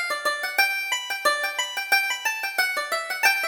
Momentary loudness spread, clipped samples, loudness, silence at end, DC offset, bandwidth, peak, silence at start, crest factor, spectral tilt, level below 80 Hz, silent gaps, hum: 5 LU; under 0.1%; -23 LUFS; 0 s; under 0.1%; over 20 kHz; -6 dBFS; 0 s; 20 dB; 2.5 dB/octave; -70 dBFS; none; none